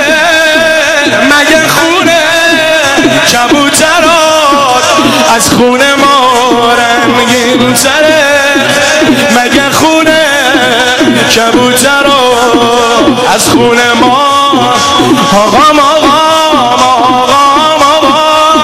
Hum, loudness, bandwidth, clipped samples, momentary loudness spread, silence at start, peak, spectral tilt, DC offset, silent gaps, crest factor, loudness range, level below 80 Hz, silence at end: none; -5 LUFS; over 20 kHz; 2%; 2 LU; 0 s; 0 dBFS; -2.5 dB/octave; 0.7%; none; 6 dB; 1 LU; -36 dBFS; 0 s